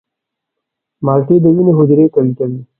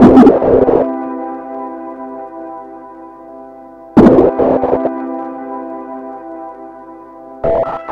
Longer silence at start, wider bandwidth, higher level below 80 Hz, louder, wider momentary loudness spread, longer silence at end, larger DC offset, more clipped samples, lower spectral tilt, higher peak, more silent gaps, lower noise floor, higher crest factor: first, 1 s vs 0 s; second, 2.7 kHz vs 6 kHz; second, -56 dBFS vs -36 dBFS; about the same, -11 LUFS vs -12 LUFS; second, 8 LU vs 26 LU; first, 0.15 s vs 0 s; neither; second, under 0.1% vs 0.2%; first, -15 dB/octave vs -9.5 dB/octave; about the same, 0 dBFS vs 0 dBFS; neither; first, -79 dBFS vs -35 dBFS; about the same, 12 dB vs 14 dB